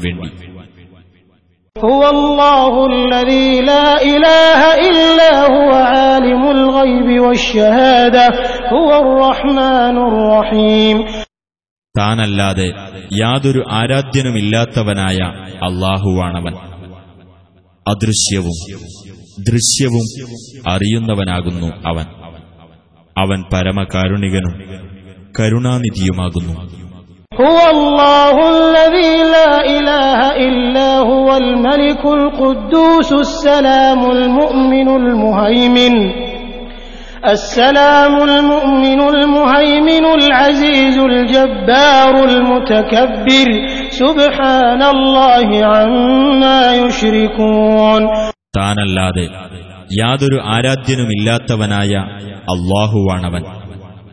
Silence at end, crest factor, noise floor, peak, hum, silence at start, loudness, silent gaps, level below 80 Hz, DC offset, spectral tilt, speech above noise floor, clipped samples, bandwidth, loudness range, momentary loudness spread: 0.15 s; 10 dB; -54 dBFS; 0 dBFS; none; 0 s; -10 LUFS; 11.71-11.82 s; -32 dBFS; under 0.1%; -5 dB/octave; 43 dB; under 0.1%; 11 kHz; 9 LU; 13 LU